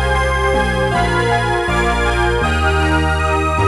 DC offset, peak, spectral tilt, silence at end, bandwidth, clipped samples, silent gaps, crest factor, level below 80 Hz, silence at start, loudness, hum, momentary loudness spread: under 0.1%; -2 dBFS; -5.5 dB/octave; 0 s; 12.5 kHz; under 0.1%; none; 12 dB; -22 dBFS; 0 s; -16 LUFS; none; 1 LU